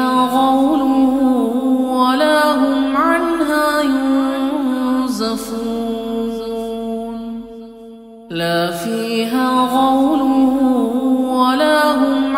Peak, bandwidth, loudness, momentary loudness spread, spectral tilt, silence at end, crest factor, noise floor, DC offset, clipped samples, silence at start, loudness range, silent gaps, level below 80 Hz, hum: -2 dBFS; 16 kHz; -16 LUFS; 10 LU; -4.5 dB/octave; 0 s; 14 dB; -37 dBFS; under 0.1%; under 0.1%; 0 s; 8 LU; none; -48 dBFS; none